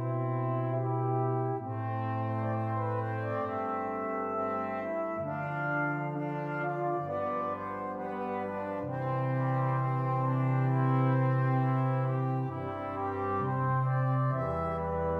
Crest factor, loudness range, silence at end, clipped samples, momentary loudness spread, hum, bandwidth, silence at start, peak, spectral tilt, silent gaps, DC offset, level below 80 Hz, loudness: 14 dB; 4 LU; 0 s; under 0.1%; 7 LU; none; 4.2 kHz; 0 s; -18 dBFS; -10.5 dB/octave; none; under 0.1%; -58 dBFS; -32 LUFS